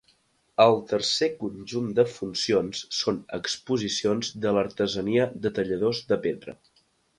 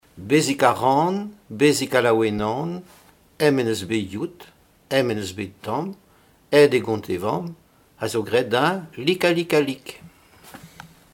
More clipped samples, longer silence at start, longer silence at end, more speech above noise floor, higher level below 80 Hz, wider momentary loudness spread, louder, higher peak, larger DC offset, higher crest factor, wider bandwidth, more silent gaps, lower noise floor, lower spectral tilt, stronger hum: neither; first, 0.6 s vs 0.15 s; first, 0.65 s vs 0.25 s; first, 40 dB vs 35 dB; about the same, -60 dBFS vs -60 dBFS; second, 10 LU vs 14 LU; second, -26 LUFS vs -21 LUFS; second, -4 dBFS vs 0 dBFS; neither; about the same, 22 dB vs 22 dB; second, 11.5 kHz vs 17 kHz; neither; first, -66 dBFS vs -56 dBFS; about the same, -4.5 dB/octave vs -5 dB/octave; neither